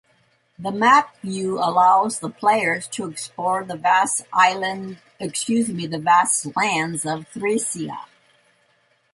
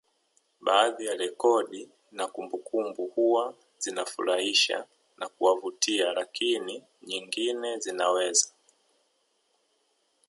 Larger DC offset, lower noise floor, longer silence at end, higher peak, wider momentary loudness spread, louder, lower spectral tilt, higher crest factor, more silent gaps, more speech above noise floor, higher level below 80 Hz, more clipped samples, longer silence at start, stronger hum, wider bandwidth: neither; second, -63 dBFS vs -72 dBFS; second, 1.1 s vs 1.8 s; first, -2 dBFS vs -6 dBFS; about the same, 14 LU vs 13 LU; first, -20 LUFS vs -27 LUFS; first, -3 dB/octave vs -0.5 dB/octave; about the same, 20 dB vs 22 dB; neither; about the same, 42 dB vs 44 dB; first, -68 dBFS vs -84 dBFS; neither; about the same, 0.6 s vs 0.6 s; neither; about the same, 11.5 kHz vs 11.5 kHz